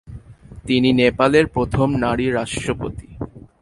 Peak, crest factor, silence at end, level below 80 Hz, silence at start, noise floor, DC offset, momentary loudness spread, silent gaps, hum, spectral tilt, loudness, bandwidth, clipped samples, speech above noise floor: -2 dBFS; 18 dB; 0.2 s; -40 dBFS; 0.05 s; -40 dBFS; under 0.1%; 18 LU; none; none; -6 dB/octave; -18 LUFS; 11.5 kHz; under 0.1%; 22 dB